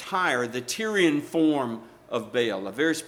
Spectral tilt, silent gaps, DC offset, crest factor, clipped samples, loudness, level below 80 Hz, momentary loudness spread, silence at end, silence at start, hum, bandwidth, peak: -4 dB/octave; none; under 0.1%; 16 dB; under 0.1%; -26 LUFS; -70 dBFS; 10 LU; 0 s; 0 s; none; 16 kHz; -10 dBFS